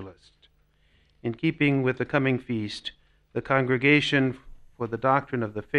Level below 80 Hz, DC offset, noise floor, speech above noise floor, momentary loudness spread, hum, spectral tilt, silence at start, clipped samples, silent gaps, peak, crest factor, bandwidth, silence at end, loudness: -56 dBFS; under 0.1%; -64 dBFS; 39 dB; 16 LU; none; -6.5 dB/octave; 0 s; under 0.1%; none; -8 dBFS; 20 dB; 10.5 kHz; 0 s; -25 LUFS